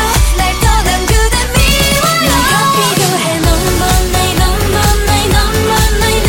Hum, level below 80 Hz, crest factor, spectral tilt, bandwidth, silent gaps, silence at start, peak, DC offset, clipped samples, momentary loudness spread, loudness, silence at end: none; -16 dBFS; 10 dB; -3.5 dB/octave; 17 kHz; none; 0 s; 0 dBFS; under 0.1%; under 0.1%; 2 LU; -11 LUFS; 0 s